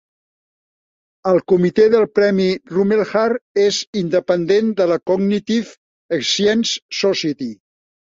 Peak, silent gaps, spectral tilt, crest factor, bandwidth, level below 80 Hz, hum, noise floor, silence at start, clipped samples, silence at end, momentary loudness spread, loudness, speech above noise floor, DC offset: -2 dBFS; 3.41-3.55 s, 3.87-3.93 s, 5.77-6.09 s, 6.82-6.89 s; -5 dB/octave; 16 dB; 7.8 kHz; -60 dBFS; none; under -90 dBFS; 1.25 s; under 0.1%; 0.55 s; 8 LU; -17 LUFS; over 74 dB; under 0.1%